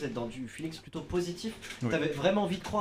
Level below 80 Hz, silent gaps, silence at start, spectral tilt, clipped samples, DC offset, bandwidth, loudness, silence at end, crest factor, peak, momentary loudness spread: -54 dBFS; none; 0 s; -5.5 dB/octave; under 0.1%; under 0.1%; 15.5 kHz; -33 LUFS; 0 s; 18 dB; -14 dBFS; 11 LU